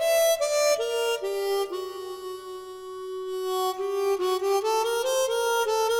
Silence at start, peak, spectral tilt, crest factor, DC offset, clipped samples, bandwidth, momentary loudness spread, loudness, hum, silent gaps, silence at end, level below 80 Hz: 0 s; -12 dBFS; -0.5 dB/octave; 14 dB; under 0.1%; under 0.1%; 19 kHz; 14 LU; -26 LUFS; none; none; 0 s; -66 dBFS